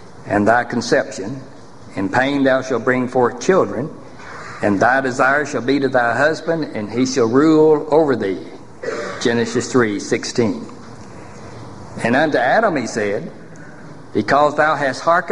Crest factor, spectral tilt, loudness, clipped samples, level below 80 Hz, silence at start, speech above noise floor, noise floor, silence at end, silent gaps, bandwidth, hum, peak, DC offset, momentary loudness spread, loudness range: 18 dB; -5 dB/octave; -17 LUFS; under 0.1%; -50 dBFS; 0 s; 21 dB; -38 dBFS; 0 s; none; 11 kHz; none; 0 dBFS; 1%; 20 LU; 4 LU